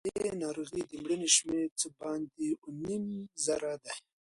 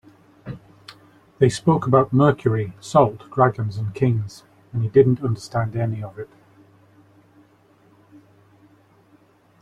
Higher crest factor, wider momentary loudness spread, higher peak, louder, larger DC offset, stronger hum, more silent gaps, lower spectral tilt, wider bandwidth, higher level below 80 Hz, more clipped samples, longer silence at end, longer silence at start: about the same, 22 dB vs 20 dB; second, 13 LU vs 21 LU; second, -12 dBFS vs -2 dBFS; second, -33 LUFS vs -20 LUFS; neither; neither; first, 1.71-1.76 s vs none; second, -2.5 dB/octave vs -7.5 dB/octave; about the same, 11.5 kHz vs 11.5 kHz; second, -68 dBFS vs -54 dBFS; neither; second, 0.35 s vs 3.35 s; second, 0.05 s vs 0.45 s